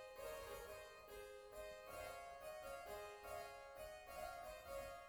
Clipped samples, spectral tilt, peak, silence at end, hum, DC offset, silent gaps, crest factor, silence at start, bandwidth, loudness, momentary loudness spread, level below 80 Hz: under 0.1%; -2.5 dB/octave; -40 dBFS; 0 s; none; under 0.1%; none; 14 dB; 0 s; over 20 kHz; -54 LUFS; 4 LU; -70 dBFS